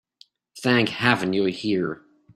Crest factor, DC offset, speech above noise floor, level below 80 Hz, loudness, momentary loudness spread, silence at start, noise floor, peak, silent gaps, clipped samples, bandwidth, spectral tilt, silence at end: 24 dB; under 0.1%; 35 dB; -62 dBFS; -22 LUFS; 9 LU; 0.55 s; -57 dBFS; -2 dBFS; none; under 0.1%; 13 kHz; -5.5 dB/octave; 0.4 s